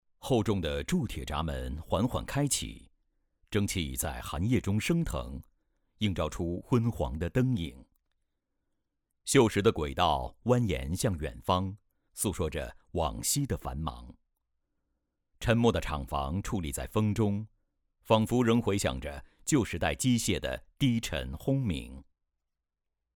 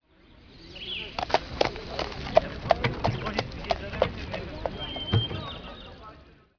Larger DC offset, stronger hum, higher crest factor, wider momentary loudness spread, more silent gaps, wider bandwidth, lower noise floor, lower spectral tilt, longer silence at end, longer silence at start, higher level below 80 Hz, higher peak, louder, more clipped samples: neither; neither; about the same, 22 dB vs 26 dB; second, 12 LU vs 17 LU; neither; first, 20 kHz vs 5.4 kHz; first, -85 dBFS vs -55 dBFS; about the same, -5 dB/octave vs -6 dB/octave; first, 1.15 s vs 0.25 s; about the same, 0.25 s vs 0.3 s; about the same, -44 dBFS vs -44 dBFS; second, -10 dBFS vs -4 dBFS; about the same, -30 LUFS vs -29 LUFS; neither